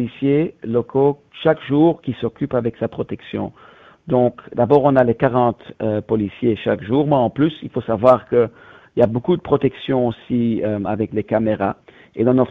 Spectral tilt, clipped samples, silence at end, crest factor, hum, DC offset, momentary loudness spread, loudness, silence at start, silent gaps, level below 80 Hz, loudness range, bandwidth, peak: -7 dB/octave; under 0.1%; 0 s; 18 dB; none; under 0.1%; 10 LU; -19 LUFS; 0 s; none; -50 dBFS; 3 LU; 5 kHz; 0 dBFS